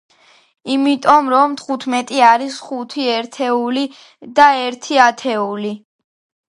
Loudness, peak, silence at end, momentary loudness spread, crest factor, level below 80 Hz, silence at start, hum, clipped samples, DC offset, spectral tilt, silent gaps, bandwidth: -15 LUFS; 0 dBFS; 0.75 s; 13 LU; 16 dB; -64 dBFS; 0.65 s; none; under 0.1%; under 0.1%; -3.5 dB/octave; none; 11.5 kHz